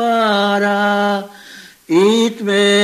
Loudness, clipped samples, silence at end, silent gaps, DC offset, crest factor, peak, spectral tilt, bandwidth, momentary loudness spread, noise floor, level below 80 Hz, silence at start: -15 LUFS; under 0.1%; 0 s; none; under 0.1%; 14 dB; -2 dBFS; -4.5 dB/octave; 15 kHz; 6 LU; -39 dBFS; -68 dBFS; 0 s